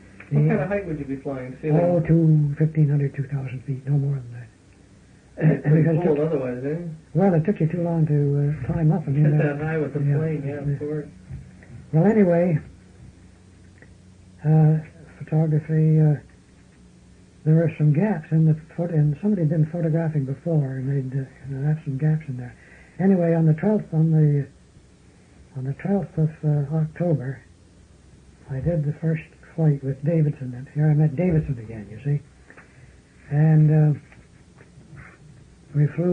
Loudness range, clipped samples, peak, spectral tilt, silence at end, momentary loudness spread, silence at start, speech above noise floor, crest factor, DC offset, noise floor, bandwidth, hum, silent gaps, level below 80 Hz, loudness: 4 LU; under 0.1%; -6 dBFS; -11 dB/octave; 0 s; 12 LU; 0.2 s; 31 dB; 16 dB; under 0.1%; -52 dBFS; 3 kHz; none; none; -52 dBFS; -22 LUFS